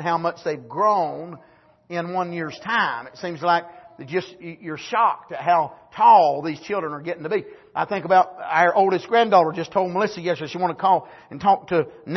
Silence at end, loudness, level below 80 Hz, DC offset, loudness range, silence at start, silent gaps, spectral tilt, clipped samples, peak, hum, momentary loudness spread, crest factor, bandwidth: 0 s; -21 LUFS; -66 dBFS; under 0.1%; 6 LU; 0 s; none; -6 dB/octave; under 0.1%; -4 dBFS; none; 13 LU; 18 dB; 6.2 kHz